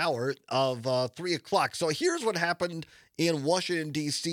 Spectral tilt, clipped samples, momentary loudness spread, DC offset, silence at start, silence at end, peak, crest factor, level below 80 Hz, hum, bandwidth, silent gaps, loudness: -4 dB/octave; under 0.1%; 5 LU; under 0.1%; 0 s; 0 s; -12 dBFS; 18 dB; -72 dBFS; none; 18 kHz; none; -29 LUFS